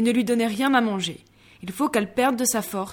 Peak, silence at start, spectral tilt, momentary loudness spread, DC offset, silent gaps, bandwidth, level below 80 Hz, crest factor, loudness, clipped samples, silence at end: -8 dBFS; 0 s; -3.5 dB/octave; 14 LU; under 0.1%; none; 20 kHz; -60 dBFS; 16 dB; -23 LUFS; under 0.1%; 0 s